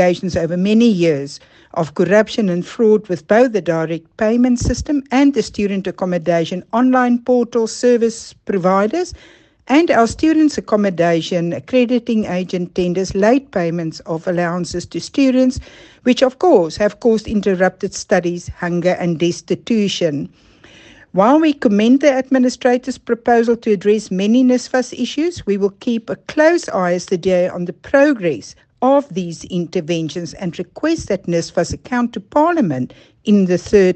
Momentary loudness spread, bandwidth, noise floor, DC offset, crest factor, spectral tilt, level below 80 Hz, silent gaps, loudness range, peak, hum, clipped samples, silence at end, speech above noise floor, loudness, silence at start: 10 LU; 8.8 kHz; -44 dBFS; under 0.1%; 16 dB; -6 dB/octave; -42 dBFS; none; 4 LU; 0 dBFS; none; under 0.1%; 0 s; 28 dB; -16 LUFS; 0 s